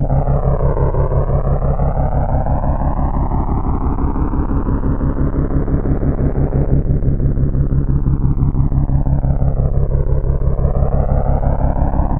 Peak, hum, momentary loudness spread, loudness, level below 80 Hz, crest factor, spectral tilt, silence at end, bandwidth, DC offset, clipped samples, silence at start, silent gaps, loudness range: 0 dBFS; none; 2 LU; -18 LUFS; -16 dBFS; 14 dB; -14 dB/octave; 0 s; 2.4 kHz; under 0.1%; under 0.1%; 0 s; none; 2 LU